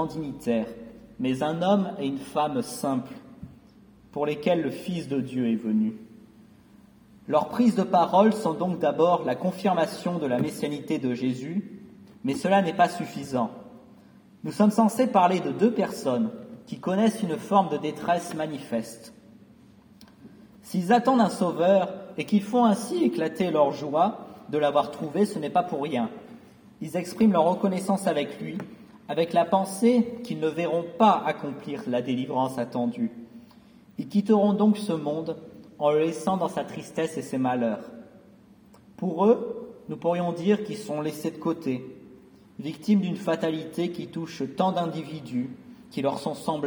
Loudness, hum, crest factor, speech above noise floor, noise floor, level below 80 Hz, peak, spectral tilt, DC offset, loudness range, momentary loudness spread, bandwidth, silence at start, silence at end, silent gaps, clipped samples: -26 LUFS; none; 20 dB; 29 dB; -54 dBFS; -66 dBFS; -6 dBFS; -6.5 dB/octave; under 0.1%; 5 LU; 14 LU; over 20 kHz; 0 s; 0 s; none; under 0.1%